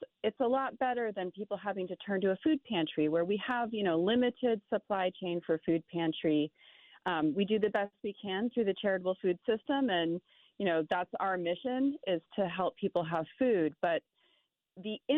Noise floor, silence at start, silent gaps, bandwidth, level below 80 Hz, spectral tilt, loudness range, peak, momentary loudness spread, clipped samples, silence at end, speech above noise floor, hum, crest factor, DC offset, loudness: -75 dBFS; 0 s; none; 4.2 kHz; -74 dBFS; -4 dB/octave; 2 LU; -18 dBFS; 7 LU; under 0.1%; 0 s; 43 dB; none; 14 dB; under 0.1%; -33 LUFS